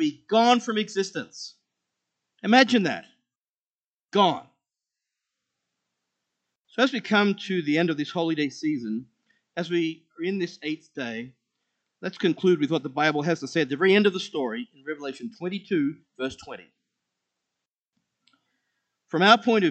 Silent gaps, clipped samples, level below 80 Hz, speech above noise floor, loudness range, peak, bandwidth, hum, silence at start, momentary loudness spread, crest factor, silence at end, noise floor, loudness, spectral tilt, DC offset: 3.36-3.78 s, 3.87-3.98 s, 17.68-17.72 s, 17.78-17.83 s; under 0.1%; -76 dBFS; over 66 dB; 9 LU; -2 dBFS; 8.6 kHz; none; 0 s; 16 LU; 24 dB; 0 s; under -90 dBFS; -24 LUFS; -5 dB/octave; under 0.1%